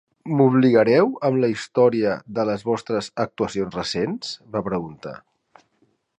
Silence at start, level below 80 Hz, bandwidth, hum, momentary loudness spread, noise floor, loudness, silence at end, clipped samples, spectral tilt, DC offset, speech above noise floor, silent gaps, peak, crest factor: 0.25 s; -58 dBFS; 10 kHz; none; 12 LU; -66 dBFS; -21 LUFS; 1 s; under 0.1%; -6.5 dB/octave; under 0.1%; 45 dB; none; -2 dBFS; 18 dB